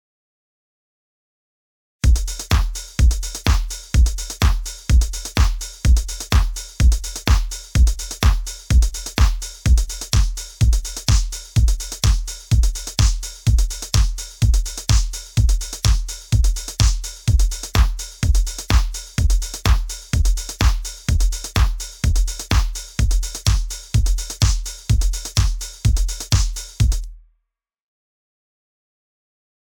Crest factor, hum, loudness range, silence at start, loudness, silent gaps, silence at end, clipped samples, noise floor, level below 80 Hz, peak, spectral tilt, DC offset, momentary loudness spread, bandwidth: 18 dB; none; 3 LU; 2.05 s; -21 LUFS; none; 2.55 s; under 0.1%; -74 dBFS; -20 dBFS; 0 dBFS; -4 dB/octave; under 0.1%; 4 LU; 18 kHz